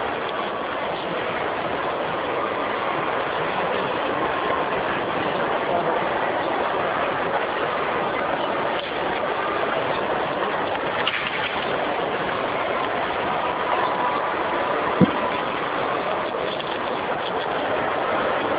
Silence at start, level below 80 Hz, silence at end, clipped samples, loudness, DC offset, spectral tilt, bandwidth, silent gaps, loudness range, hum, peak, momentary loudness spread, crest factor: 0 s; -54 dBFS; 0 s; under 0.1%; -24 LUFS; under 0.1%; -8 dB/octave; 5.2 kHz; none; 2 LU; none; -2 dBFS; 3 LU; 22 dB